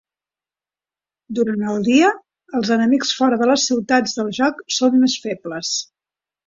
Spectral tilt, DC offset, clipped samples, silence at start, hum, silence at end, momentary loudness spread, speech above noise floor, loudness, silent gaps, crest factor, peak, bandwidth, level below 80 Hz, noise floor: -3.5 dB/octave; under 0.1%; under 0.1%; 1.3 s; none; 0.65 s; 10 LU; over 72 dB; -18 LUFS; none; 16 dB; -4 dBFS; 7.8 kHz; -64 dBFS; under -90 dBFS